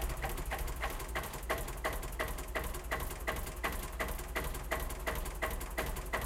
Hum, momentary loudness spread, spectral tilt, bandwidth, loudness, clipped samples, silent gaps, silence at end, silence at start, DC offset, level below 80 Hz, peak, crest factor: none; 2 LU; -3.5 dB/octave; 17 kHz; -39 LUFS; under 0.1%; none; 0 s; 0 s; under 0.1%; -42 dBFS; -18 dBFS; 20 dB